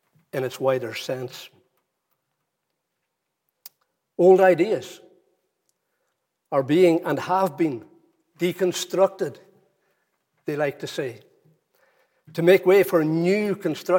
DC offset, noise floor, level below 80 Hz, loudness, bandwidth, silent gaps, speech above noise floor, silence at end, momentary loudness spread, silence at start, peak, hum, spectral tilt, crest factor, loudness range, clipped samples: under 0.1%; -79 dBFS; -80 dBFS; -22 LUFS; 17 kHz; none; 58 dB; 0 s; 17 LU; 0.35 s; -4 dBFS; none; -6 dB/octave; 20 dB; 10 LU; under 0.1%